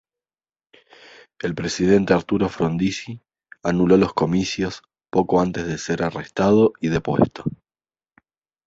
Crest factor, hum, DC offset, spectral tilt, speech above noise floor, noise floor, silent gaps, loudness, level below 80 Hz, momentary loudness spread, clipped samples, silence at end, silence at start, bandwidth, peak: 20 dB; none; under 0.1%; -6.5 dB/octave; over 70 dB; under -90 dBFS; none; -21 LUFS; -48 dBFS; 13 LU; under 0.1%; 1.15 s; 1.45 s; 8 kHz; -2 dBFS